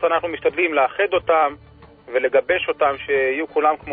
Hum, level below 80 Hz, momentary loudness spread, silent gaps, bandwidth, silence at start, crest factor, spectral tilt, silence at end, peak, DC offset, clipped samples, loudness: none; -52 dBFS; 4 LU; none; 4.3 kHz; 0 s; 16 dB; -9 dB/octave; 0 s; -4 dBFS; under 0.1%; under 0.1%; -20 LUFS